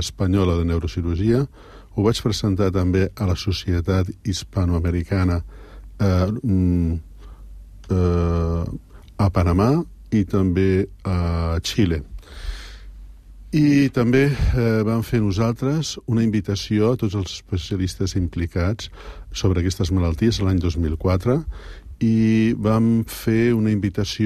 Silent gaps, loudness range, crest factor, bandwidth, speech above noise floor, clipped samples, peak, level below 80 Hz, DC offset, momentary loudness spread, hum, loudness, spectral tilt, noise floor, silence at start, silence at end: none; 3 LU; 16 dB; 14.5 kHz; 21 dB; under 0.1%; -4 dBFS; -34 dBFS; under 0.1%; 9 LU; none; -21 LUFS; -7 dB/octave; -40 dBFS; 0 s; 0 s